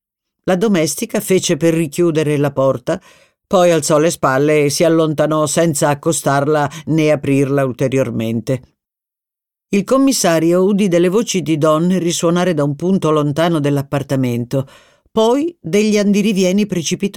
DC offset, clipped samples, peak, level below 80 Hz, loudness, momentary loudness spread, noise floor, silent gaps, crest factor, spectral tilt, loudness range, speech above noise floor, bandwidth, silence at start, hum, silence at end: under 0.1%; under 0.1%; -2 dBFS; -54 dBFS; -15 LUFS; 6 LU; -86 dBFS; none; 12 dB; -5.5 dB/octave; 3 LU; 72 dB; 18 kHz; 0.45 s; none; 0 s